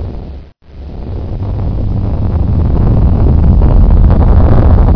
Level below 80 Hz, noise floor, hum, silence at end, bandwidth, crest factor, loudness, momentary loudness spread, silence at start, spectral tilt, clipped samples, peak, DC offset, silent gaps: -10 dBFS; -29 dBFS; none; 0 s; 5.4 kHz; 8 dB; -11 LUFS; 17 LU; 0 s; -11.5 dB/octave; 0.6%; 0 dBFS; under 0.1%; none